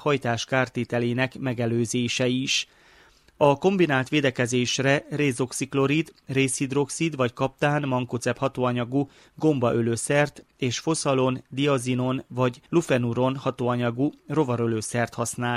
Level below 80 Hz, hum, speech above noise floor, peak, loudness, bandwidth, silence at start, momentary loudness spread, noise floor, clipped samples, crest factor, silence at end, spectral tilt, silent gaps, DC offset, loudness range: -60 dBFS; none; 32 dB; -4 dBFS; -25 LUFS; 14 kHz; 0 s; 5 LU; -56 dBFS; under 0.1%; 20 dB; 0 s; -5 dB/octave; none; under 0.1%; 2 LU